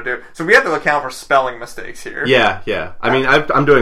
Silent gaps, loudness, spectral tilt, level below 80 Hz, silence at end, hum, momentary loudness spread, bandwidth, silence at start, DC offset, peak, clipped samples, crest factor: none; -15 LUFS; -4.5 dB/octave; -40 dBFS; 0 s; none; 15 LU; 14.5 kHz; 0 s; under 0.1%; 0 dBFS; under 0.1%; 16 dB